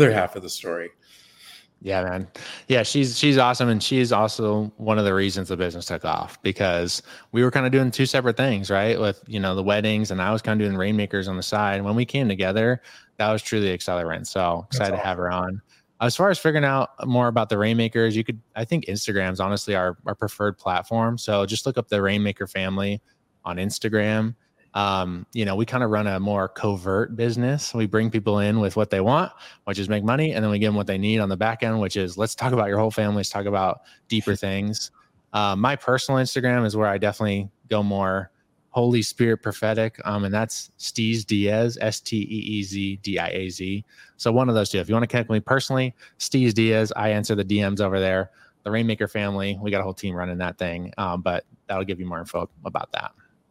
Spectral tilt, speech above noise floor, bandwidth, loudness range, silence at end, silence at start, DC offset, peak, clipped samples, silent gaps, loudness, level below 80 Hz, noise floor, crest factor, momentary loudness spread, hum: -5.5 dB/octave; 26 dB; 16 kHz; 3 LU; 0.4 s; 0 s; under 0.1%; -2 dBFS; under 0.1%; none; -23 LUFS; -58 dBFS; -49 dBFS; 22 dB; 9 LU; none